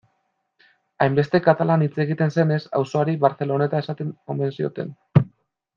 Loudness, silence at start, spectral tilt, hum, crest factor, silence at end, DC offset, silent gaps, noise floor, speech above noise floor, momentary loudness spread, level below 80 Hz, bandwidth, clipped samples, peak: -22 LUFS; 1 s; -8.5 dB/octave; none; 20 dB; 0.5 s; under 0.1%; none; -72 dBFS; 51 dB; 10 LU; -56 dBFS; 7.2 kHz; under 0.1%; -2 dBFS